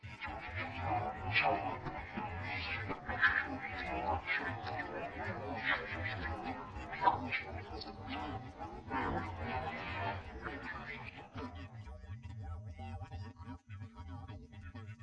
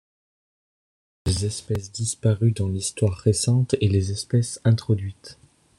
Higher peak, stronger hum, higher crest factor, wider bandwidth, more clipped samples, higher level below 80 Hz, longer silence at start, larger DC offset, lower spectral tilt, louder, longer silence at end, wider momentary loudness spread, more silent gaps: second, -16 dBFS vs -6 dBFS; neither; first, 24 dB vs 18 dB; second, 8.8 kHz vs 12.5 kHz; neither; second, -54 dBFS vs -48 dBFS; second, 0 s vs 1.25 s; neither; about the same, -6.5 dB/octave vs -6 dB/octave; second, -39 LUFS vs -23 LUFS; second, 0 s vs 0.45 s; first, 17 LU vs 8 LU; neither